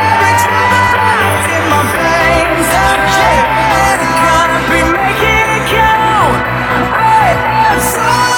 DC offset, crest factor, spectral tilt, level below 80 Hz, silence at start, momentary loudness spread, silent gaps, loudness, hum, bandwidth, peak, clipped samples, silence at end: under 0.1%; 10 dB; -4 dB/octave; -28 dBFS; 0 s; 2 LU; none; -9 LUFS; none; 19.5 kHz; 0 dBFS; under 0.1%; 0 s